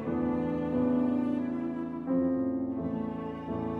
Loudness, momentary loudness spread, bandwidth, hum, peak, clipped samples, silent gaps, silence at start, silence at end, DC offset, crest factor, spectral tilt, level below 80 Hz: -31 LUFS; 8 LU; 4.1 kHz; none; -18 dBFS; under 0.1%; none; 0 s; 0 s; under 0.1%; 12 dB; -10 dB/octave; -56 dBFS